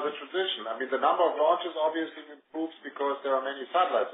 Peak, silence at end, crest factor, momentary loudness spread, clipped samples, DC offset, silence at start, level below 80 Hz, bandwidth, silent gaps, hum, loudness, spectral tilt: -10 dBFS; 0 s; 18 dB; 12 LU; under 0.1%; under 0.1%; 0 s; under -90 dBFS; 3.9 kHz; none; none; -29 LUFS; 3.5 dB/octave